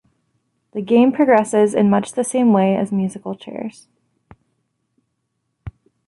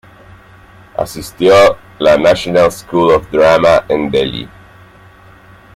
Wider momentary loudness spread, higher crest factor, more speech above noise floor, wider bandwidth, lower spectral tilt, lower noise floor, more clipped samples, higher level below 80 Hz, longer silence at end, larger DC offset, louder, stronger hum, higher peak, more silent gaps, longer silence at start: first, 21 LU vs 14 LU; about the same, 16 dB vs 12 dB; first, 56 dB vs 30 dB; second, 11.5 kHz vs 15.5 kHz; first, -6.5 dB/octave vs -5 dB/octave; first, -73 dBFS vs -40 dBFS; neither; second, -54 dBFS vs -40 dBFS; second, 0.4 s vs 1.3 s; neither; second, -16 LUFS vs -11 LUFS; neither; about the same, -2 dBFS vs 0 dBFS; neither; second, 0.75 s vs 1 s